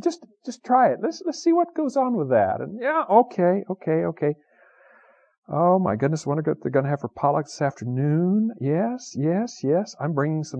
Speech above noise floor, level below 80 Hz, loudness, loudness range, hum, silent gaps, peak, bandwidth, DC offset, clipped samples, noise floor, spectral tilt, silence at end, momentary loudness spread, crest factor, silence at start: 34 dB; -70 dBFS; -23 LUFS; 3 LU; none; 5.38-5.42 s; -4 dBFS; 8.8 kHz; under 0.1%; under 0.1%; -56 dBFS; -7.5 dB/octave; 0 s; 8 LU; 18 dB; 0 s